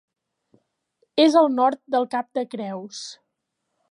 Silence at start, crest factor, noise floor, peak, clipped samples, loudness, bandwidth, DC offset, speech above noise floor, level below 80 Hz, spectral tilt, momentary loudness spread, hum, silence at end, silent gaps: 1.15 s; 20 dB; -78 dBFS; -4 dBFS; under 0.1%; -21 LUFS; 11 kHz; under 0.1%; 57 dB; -82 dBFS; -4.5 dB/octave; 18 LU; none; 0.75 s; none